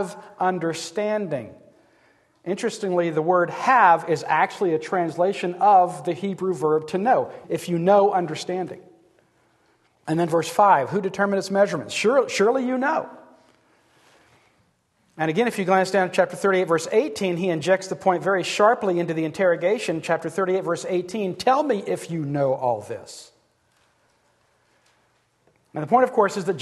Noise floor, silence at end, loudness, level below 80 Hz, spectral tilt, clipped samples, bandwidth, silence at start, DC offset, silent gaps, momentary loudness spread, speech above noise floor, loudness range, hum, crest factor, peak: -65 dBFS; 0 s; -22 LUFS; -70 dBFS; -5.5 dB/octave; under 0.1%; 12.5 kHz; 0 s; under 0.1%; none; 11 LU; 44 dB; 6 LU; none; 20 dB; -4 dBFS